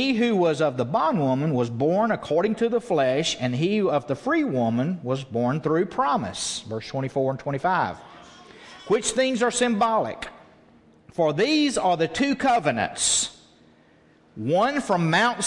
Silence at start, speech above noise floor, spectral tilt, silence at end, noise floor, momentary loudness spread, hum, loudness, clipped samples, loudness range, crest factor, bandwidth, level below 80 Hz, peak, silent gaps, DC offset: 0 s; 34 dB; -4.5 dB/octave; 0 s; -56 dBFS; 8 LU; none; -23 LUFS; under 0.1%; 3 LU; 16 dB; 11.5 kHz; -60 dBFS; -8 dBFS; none; under 0.1%